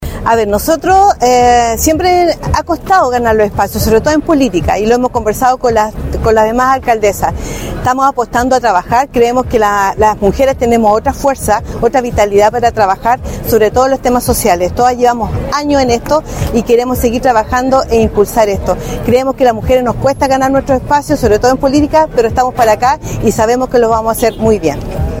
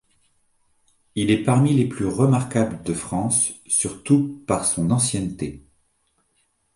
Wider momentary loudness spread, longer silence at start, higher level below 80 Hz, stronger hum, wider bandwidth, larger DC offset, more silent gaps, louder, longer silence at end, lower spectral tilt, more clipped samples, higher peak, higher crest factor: second, 5 LU vs 9 LU; second, 0 s vs 1.15 s; first, -26 dBFS vs -50 dBFS; neither; first, 17 kHz vs 11.5 kHz; neither; neither; first, -11 LUFS vs -21 LUFS; second, 0 s vs 1.15 s; about the same, -5 dB/octave vs -5 dB/octave; first, 0.5% vs under 0.1%; first, 0 dBFS vs -4 dBFS; second, 10 dB vs 18 dB